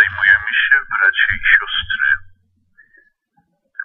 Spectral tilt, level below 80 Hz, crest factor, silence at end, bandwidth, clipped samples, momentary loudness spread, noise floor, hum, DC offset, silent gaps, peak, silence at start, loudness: -3.5 dB/octave; -44 dBFS; 16 dB; 0 s; 4.2 kHz; under 0.1%; 7 LU; -63 dBFS; none; under 0.1%; none; 0 dBFS; 0 s; -14 LUFS